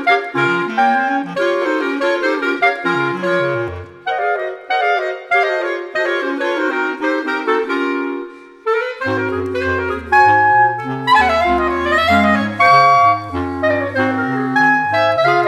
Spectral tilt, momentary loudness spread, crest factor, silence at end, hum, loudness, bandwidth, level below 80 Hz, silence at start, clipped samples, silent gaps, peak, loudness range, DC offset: -5.5 dB/octave; 9 LU; 14 dB; 0 s; none; -15 LUFS; 13.5 kHz; -44 dBFS; 0 s; under 0.1%; none; 0 dBFS; 6 LU; under 0.1%